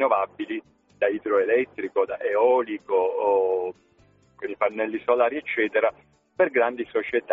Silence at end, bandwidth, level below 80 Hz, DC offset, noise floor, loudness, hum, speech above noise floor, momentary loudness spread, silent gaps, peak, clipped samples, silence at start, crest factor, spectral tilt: 0 s; 3.9 kHz; -68 dBFS; under 0.1%; -59 dBFS; -24 LUFS; none; 36 dB; 8 LU; none; -8 dBFS; under 0.1%; 0 s; 16 dB; -2.5 dB/octave